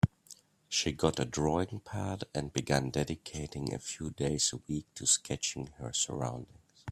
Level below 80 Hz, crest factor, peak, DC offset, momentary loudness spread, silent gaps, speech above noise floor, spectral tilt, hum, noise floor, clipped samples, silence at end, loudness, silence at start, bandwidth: -56 dBFS; 24 dB; -10 dBFS; under 0.1%; 11 LU; none; 24 dB; -3.5 dB/octave; none; -58 dBFS; under 0.1%; 0 s; -33 LUFS; 0.05 s; 14.5 kHz